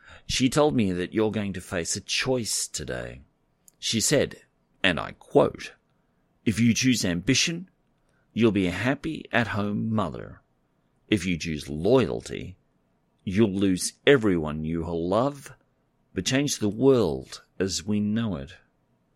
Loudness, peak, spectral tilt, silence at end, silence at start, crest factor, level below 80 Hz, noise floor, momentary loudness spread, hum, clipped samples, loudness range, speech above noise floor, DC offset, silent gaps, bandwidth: -25 LUFS; -4 dBFS; -4.5 dB/octave; 0.6 s; 0.1 s; 22 dB; -50 dBFS; -69 dBFS; 14 LU; none; under 0.1%; 3 LU; 44 dB; under 0.1%; none; 16 kHz